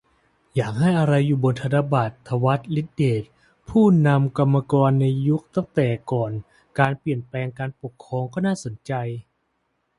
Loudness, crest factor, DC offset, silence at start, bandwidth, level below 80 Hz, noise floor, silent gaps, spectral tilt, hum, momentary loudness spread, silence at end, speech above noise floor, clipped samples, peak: -22 LUFS; 20 dB; under 0.1%; 0.55 s; 11 kHz; -54 dBFS; -71 dBFS; none; -8 dB/octave; none; 11 LU; 0.75 s; 51 dB; under 0.1%; -2 dBFS